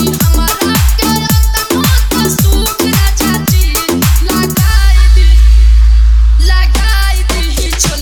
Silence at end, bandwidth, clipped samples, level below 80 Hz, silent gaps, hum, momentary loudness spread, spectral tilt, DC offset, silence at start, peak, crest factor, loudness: 0 s; over 20 kHz; 0.4%; -8 dBFS; none; none; 4 LU; -4.5 dB/octave; under 0.1%; 0 s; 0 dBFS; 8 dB; -10 LUFS